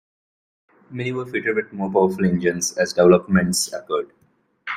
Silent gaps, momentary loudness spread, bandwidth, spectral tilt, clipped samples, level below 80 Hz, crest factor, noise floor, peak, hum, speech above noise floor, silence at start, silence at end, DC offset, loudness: none; 13 LU; 15.5 kHz; -5 dB/octave; under 0.1%; -54 dBFS; 20 dB; -40 dBFS; -2 dBFS; none; 20 dB; 0.9 s; 0 s; under 0.1%; -20 LUFS